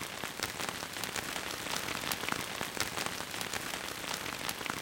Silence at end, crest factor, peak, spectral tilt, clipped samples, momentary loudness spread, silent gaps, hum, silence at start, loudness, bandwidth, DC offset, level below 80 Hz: 0 s; 28 dB; -10 dBFS; -1.5 dB/octave; under 0.1%; 3 LU; none; none; 0 s; -36 LUFS; 17 kHz; under 0.1%; -62 dBFS